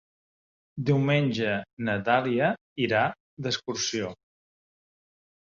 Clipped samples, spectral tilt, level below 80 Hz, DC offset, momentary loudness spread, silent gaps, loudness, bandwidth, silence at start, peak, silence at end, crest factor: under 0.1%; -5 dB/octave; -64 dBFS; under 0.1%; 9 LU; 1.73-1.77 s, 2.61-2.76 s, 3.20-3.37 s; -27 LUFS; 7.4 kHz; 0.75 s; -8 dBFS; 1.45 s; 20 dB